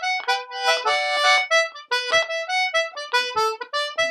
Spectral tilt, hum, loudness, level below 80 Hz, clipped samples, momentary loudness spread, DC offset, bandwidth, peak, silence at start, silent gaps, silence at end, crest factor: 1.5 dB/octave; none; -21 LUFS; -74 dBFS; under 0.1%; 7 LU; under 0.1%; 15 kHz; -4 dBFS; 0 s; none; 0 s; 18 dB